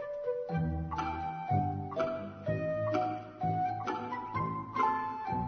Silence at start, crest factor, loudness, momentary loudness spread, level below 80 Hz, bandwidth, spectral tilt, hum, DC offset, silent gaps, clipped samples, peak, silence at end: 0 s; 16 dB; -34 LUFS; 5 LU; -52 dBFS; 6.4 kHz; -6.5 dB/octave; none; under 0.1%; none; under 0.1%; -18 dBFS; 0 s